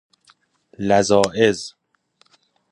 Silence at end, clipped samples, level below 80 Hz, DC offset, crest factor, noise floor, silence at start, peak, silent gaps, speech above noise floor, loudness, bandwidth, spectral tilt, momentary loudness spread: 1 s; under 0.1%; -54 dBFS; under 0.1%; 22 dB; -62 dBFS; 0.8 s; 0 dBFS; none; 45 dB; -18 LUFS; 11.5 kHz; -4.5 dB/octave; 14 LU